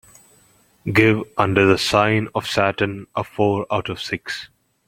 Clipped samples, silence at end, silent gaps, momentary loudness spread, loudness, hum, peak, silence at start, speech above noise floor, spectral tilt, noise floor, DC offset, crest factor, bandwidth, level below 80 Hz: under 0.1%; 0.4 s; none; 12 LU; -19 LUFS; none; -2 dBFS; 0.85 s; 37 dB; -5.5 dB/octave; -56 dBFS; under 0.1%; 20 dB; 16.5 kHz; -52 dBFS